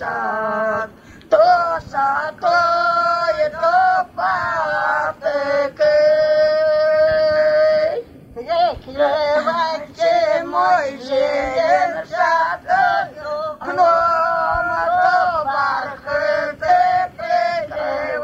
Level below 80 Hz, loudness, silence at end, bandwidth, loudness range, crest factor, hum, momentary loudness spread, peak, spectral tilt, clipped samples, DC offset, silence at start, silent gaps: -50 dBFS; -17 LUFS; 0 s; 8 kHz; 2 LU; 16 dB; none; 7 LU; -2 dBFS; -4 dB/octave; under 0.1%; under 0.1%; 0 s; none